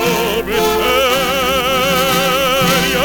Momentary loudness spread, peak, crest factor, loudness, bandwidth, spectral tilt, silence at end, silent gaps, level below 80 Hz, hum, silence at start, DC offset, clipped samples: 3 LU; -2 dBFS; 12 dB; -13 LUFS; 19.5 kHz; -3 dB/octave; 0 s; none; -34 dBFS; none; 0 s; under 0.1%; under 0.1%